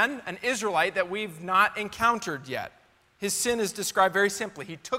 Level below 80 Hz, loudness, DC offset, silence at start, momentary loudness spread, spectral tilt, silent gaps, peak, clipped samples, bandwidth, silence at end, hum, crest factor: -62 dBFS; -26 LUFS; under 0.1%; 0 s; 12 LU; -2.5 dB/octave; none; -8 dBFS; under 0.1%; 16 kHz; 0 s; none; 20 dB